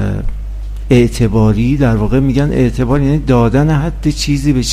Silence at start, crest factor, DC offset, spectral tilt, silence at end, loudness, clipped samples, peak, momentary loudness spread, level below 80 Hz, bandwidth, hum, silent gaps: 0 s; 12 dB; under 0.1%; -6.5 dB/octave; 0 s; -13 LUFS; 0.1%; 0 dBFS; 10 LU; -22 dBFS; 15 kHz; none; none